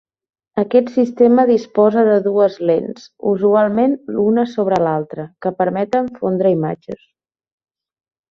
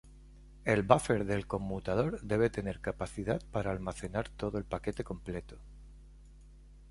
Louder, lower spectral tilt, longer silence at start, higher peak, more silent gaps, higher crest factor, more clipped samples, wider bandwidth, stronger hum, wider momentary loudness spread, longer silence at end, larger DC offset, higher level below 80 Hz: first, -16 LUFS vs -34 LUFS; first, -8.5 dB/octave vs -6.5 dB/octave; first, 0.55 s vs 0.05 s; first, -2 dBFS vs -6 dBFS; neither; second, 14 dB vs 28 dB; neither; second, 7 kHz vs 11.5 kHz; neither; about the same, 11 LU vs 13 LU; first, 1.35 s vs 0 s; neither; second, -60 dBFS vs -50 dBFS